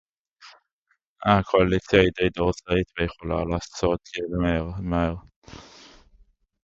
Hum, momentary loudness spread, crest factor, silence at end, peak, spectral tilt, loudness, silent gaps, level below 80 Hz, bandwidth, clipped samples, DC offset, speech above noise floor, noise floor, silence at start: none; 10 LU; 22 dB; 1.05 s; -2 dBFS; -6.5 dB/octave; -24 LUFS; 0.73-0.86 s, 1.07-1.16 s, 5.36-5.42 s; -40 dBFS; 7.8 kHz; under 0.1%; under 0.1%; 49 dB; -72 dBFS; 0.45 s